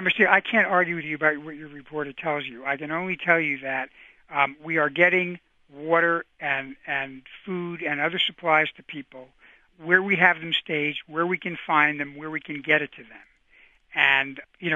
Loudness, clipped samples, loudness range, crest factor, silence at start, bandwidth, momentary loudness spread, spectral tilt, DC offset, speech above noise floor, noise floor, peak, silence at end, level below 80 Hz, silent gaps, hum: -23 LUFS; under 0.1%; 3 LU; 24 dB; 0 s; 7.6 kHz; 15 LU; -6.5 dB/octave; under 0.1%; 33 dB; -58 dBFS; -2 dBFS; 0 s; -68 dBFS; none; none